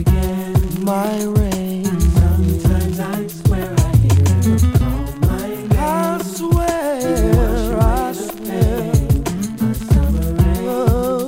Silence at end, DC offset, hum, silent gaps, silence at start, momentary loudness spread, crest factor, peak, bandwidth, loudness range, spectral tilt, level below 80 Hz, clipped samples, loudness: 0 s; under 0.1%; none; none; 0 s; 6 LU; 14 dB; -2 dBFS; 16.5 kHz; 2 LU; -7 dB/octave; -22 dBFS; under 0.1%; -17 LUFS